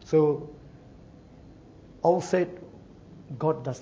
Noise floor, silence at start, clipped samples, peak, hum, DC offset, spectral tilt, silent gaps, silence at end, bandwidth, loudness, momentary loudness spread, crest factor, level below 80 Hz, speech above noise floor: -50 dBFS; 0 s; under 0.1%; -10 dBFS; none; under 0.1%; -7.5 dB/octave; none; 0 s; 8 kHz; -27 LUFS; 25 LU; 20 dB; -58 dBFS; 25 dB